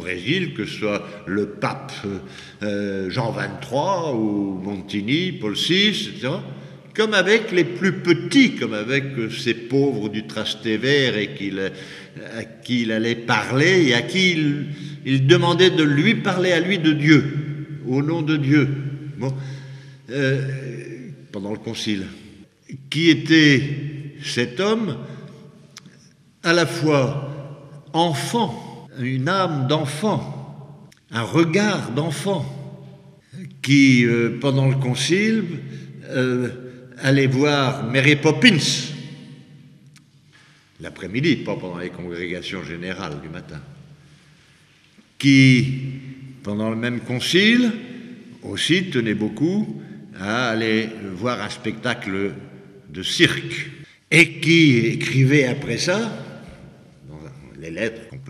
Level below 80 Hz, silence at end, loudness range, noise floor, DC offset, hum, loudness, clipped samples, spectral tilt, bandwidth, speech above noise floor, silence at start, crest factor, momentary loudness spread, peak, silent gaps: -60 dBFS; 0 s; 8 LU; -54 dBFS; under 0.1%; none; -20 LUFS; under 0.1%; -5.5 dB/octave; 13.5 kHz; 34 dB; 0 s; 20 dB; 21 LU; 0 dBFS; none